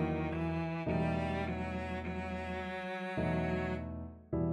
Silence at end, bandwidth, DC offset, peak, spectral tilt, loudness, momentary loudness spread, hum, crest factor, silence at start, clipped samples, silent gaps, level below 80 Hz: 0 s; 9.8 kHz; under 0.1%; -22 dBFS; -8 dB/octave; -37 LUFS; 6 LU; none; 14 dB; 0 s; under 0.1%; none; -50 dBFS